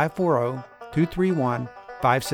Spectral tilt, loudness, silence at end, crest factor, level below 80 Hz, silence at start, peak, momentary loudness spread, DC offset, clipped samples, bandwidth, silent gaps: -6.5 dB/octave; -24 LUFS; 0 s; 18 dB; -50 dBFS; 0 s; -6 dBFS; 9 LU; under 0.1%; under 0.1%; 18.5 kHz; none